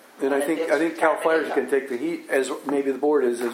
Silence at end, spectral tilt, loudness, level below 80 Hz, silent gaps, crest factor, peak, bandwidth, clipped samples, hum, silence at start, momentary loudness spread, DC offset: 0 s; -4 dB/octave; -23 LUFS; -82 dBFS; none; 18 dB; -6 dBFS; 16 kHz; under 0.1%; none; 0.15 s; 4 LU; under 0.1%